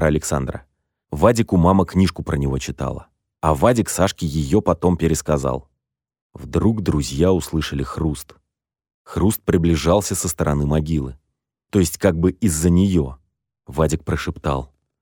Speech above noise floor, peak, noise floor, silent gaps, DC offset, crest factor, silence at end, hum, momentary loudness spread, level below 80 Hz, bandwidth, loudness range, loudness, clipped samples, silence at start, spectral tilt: 60 dB; -2 dBFS; -79 dBFS; 6.21-6.30 s, 8.94-9.05 s; under 0.1%; 18 dB; 0.35 s; none; 11 LU; -34 dBFS; 19.5 kHz; 3 LU; -20 LUFS; under 0.1%; 0 s; -6 dB/octave